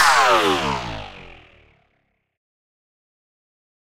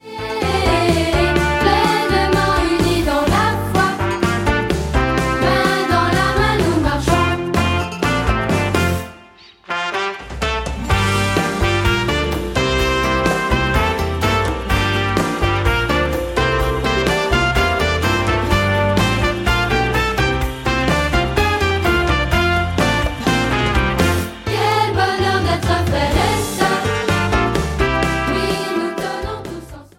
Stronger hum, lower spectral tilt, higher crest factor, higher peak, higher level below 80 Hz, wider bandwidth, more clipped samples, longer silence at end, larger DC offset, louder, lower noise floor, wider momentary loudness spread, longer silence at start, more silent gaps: neither; second, -2.5 dB/octave vs -5 dB/octave; about the same, 20 dB vs 16 dB; about the same, -2 dBFS vs -2 dBFS; second, -48 dBFS vs -26 dBFS; about the same, 16 kHz vs 17 kHz; neither; first, 2.65 s vs 0.15 s; neither; about the same, -17 LUFS vs -17 LUFS; first, -69 dBFS vs -44 dBFS; first, 23 LU vs 4 LU; about the same, 0 s vs 0.05 s; neither